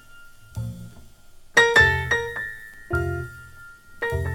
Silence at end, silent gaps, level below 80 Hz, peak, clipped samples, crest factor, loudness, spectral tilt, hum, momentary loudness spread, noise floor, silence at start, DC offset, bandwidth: 0 s; none; -40 dBFS; -2 dBFS; under 0.1%; 22 dB; -21 LUFS; -4 dB/octave; none; 24 LU; -46 dBFS; 0.1 s; under 0.1%; 17.5 kHz